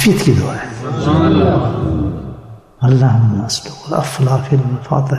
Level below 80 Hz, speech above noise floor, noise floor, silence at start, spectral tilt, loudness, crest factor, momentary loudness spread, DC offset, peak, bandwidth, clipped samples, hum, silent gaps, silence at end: -38 dBFS; 21 dB; -34 dBFS; 0 s; -6.5 dB/octave; -15 LUFS; 12 dB; 11 LU; under 0.1%; -2 dBFS; 14 kHz; under 0.1%; none; none; 0 s